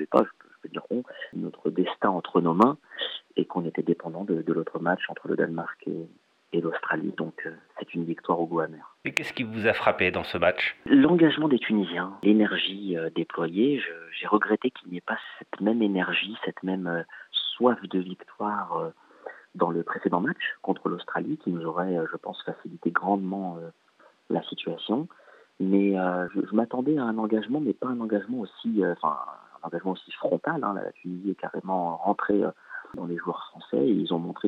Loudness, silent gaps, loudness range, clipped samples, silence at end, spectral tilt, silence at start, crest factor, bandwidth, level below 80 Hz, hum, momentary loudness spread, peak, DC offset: -27 LUFS; none; 7 LU; under 0.1%; 0 s; -7 dB/octave; 0 s; 22 dB; 8.8 kHz; -70 dBFS; none; 13 LU; -6 dBFS; under 0.1%